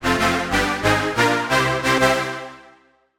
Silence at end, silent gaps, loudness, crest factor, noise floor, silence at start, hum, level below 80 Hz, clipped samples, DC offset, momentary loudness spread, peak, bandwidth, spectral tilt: 0.55 s; none; -19 LUFS; 16 dB; -54 dBFS; 0 s; none; -40 dBFS; under 0.1%; under 0.1%; 9 LU; -4 dBFS; 17 kHz; -4 dB/octave